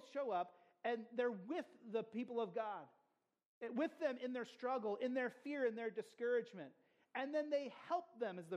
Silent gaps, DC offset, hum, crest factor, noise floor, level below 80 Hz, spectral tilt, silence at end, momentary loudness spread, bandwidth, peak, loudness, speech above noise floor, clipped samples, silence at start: 3.46-3.61 s; under 0.1%; none; 16 dB; -84 dBFS; under -90 dBFS; -6 dB/octave; 0 s; 7 LU; 11 kHz; -28 dBFS; -44 LUFS; 41 dB; under 0.1%; 0 s